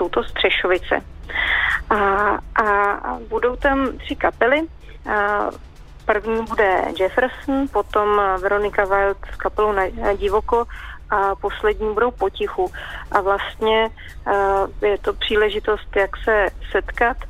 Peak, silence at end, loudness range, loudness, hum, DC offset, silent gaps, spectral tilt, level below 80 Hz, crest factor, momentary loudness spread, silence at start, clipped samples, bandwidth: -2 dBFS; 0 s; 2 LU; -20 LUFS; none; under 0.1%; none; -5.5 dB/octave; -36 dBFS; 18 dB; 7 LU; 0 s; under 0.1%; 14 kHz